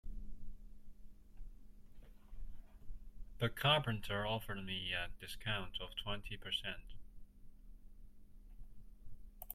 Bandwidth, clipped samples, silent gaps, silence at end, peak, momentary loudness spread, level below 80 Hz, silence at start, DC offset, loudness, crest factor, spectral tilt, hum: 16.5 kHz; under 0.1%; none; 0 s; -18 dBFS; 27 LU; -52 dBFS; 0.05 s; under 0.1%; -40 LUFS; 26 dB; -5 dB/octave; none